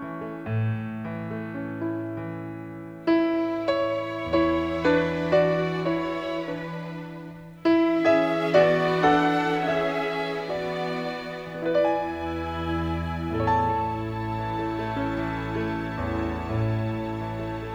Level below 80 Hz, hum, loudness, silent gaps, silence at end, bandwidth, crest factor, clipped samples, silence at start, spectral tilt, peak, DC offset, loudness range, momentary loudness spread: -46 dBFS; none; -26 LUFS; none; 0 s; 9.4 kHz; 20 dB; under 0.1%; 0 s; -7.5 dB/octave; -6 dBFS; under 0.1%; 6 LU; 12 LU